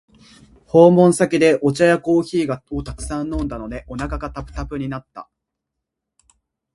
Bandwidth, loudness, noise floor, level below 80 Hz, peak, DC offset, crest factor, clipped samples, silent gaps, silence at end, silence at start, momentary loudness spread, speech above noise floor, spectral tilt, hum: 11.5 kHz; -18 LUFS; -81 dBFS; -38 dBFS; 0 dBFS; under 0.1%; 18 dB; under 0.1%; none; 1.5 s; 0.75 s; 17 LU; 63 dB; -6.5 dB/octave; none